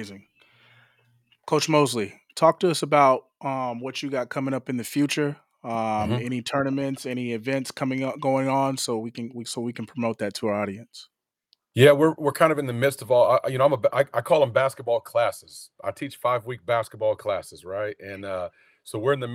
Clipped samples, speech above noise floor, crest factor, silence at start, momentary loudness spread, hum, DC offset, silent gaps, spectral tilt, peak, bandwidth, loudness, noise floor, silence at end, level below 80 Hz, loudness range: under 0.1%; 44 dB; 22 dB; 0 s; 13 LU; none; under 0.1%; none; -5.5 dB/octave; -2 dBFS; 16.5 kHz; -24 LUFS; -68 dBFS; 0 s; -70 dBFS; 7 LU